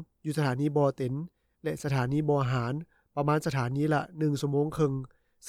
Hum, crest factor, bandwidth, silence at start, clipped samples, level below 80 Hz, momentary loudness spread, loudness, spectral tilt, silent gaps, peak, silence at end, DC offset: none; 14 dB; 15 kHz; 0 s; under 0.1%; -60 dBFS; 11 LU; -30 LUFS; -7.5 dB/octave; none; -14 dBFS; 0 s; under 0.1%